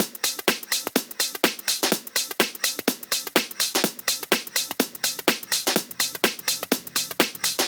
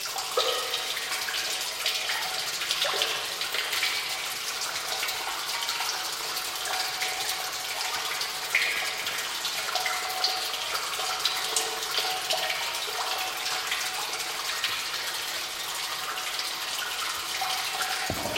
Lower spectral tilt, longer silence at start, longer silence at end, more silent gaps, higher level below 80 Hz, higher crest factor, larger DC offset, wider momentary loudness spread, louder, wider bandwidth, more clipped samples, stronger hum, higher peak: first, -1 dB/octave vs 1 dB/octave; about the same, 0 s vs 0 s; about the same, 0 s vs 0 s; neither; about the same, -68 dBFS vs -64 dBFS; about the same, 24 dB vs 22 dB; neither; about the same, 4 LU vs 4 LU; first, -24 LUFS vs -28 LUFS; first, over 20 kHz vs 16.5 kHz; neither; neither; first, -2 dBFS vs -8 dBFS